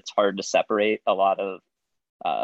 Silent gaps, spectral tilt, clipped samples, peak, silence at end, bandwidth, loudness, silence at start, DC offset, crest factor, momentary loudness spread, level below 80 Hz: 2.09-2.20 s; -3.5 dB/octave; under 0.1%; -6 dBFS; 0 s; 8.2 kHz; -24 LUFS; 0.05 s; under 0.1%; 18 dB; 10 LU; -78 dBFS